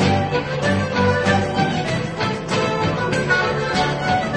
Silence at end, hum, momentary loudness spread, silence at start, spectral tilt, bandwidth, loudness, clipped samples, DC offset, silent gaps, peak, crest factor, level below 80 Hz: 0 s; none; 4 LU; 0 s; -5.5 dB/octave; 10 kHz; -19 LUFS; under 0.1%; under 0.1%; none; -4 dBFS; 16 dB; -42 dBFS